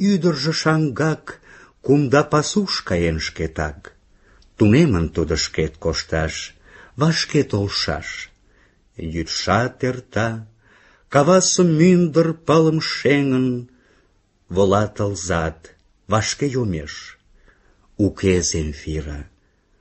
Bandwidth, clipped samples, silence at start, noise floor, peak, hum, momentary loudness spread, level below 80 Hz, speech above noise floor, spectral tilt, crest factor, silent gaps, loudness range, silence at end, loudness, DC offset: 8.6 kHz; under 0.1%; 0 s; -60 dBFS; 0 dBFS; none; 14 LU; -38 dBFS; 41 dB; -5 dB/octave; 20 dB; none; 7 LU; 0.55 s; -19 LUFS; under 0.1%